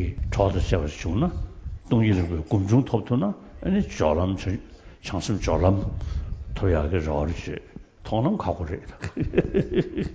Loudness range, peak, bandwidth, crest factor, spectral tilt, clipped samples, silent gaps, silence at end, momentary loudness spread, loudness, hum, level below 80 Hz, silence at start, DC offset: 3 LU; -4 dBFS; 8 kHz; 20 dB; -7.5 dB/octave; under 0.1%; none; 0 s; 13 LU; -25 LUFS; none; -34 dBFS; 0 s; under 0.1%